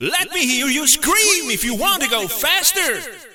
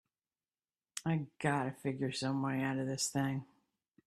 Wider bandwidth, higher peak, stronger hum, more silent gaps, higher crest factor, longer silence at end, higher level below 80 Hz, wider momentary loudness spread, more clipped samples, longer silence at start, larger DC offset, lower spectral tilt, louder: first, 17 kHz vs 14.5 kHz; first, 0 dBFS vs -18 dBFS; neither; neither; about the same, 18 dB vs 20 dB; second, 0.05 s vs 0.6 s; first, -44 dBFS vs -74 dBFS; about the same, 6 LU vs 5 LU; neither; second, 0 s vs 0.95 s; neither; second, 0 dB/octave vs -5 dB/octave; first, -15 LUFS vs -36 LUFS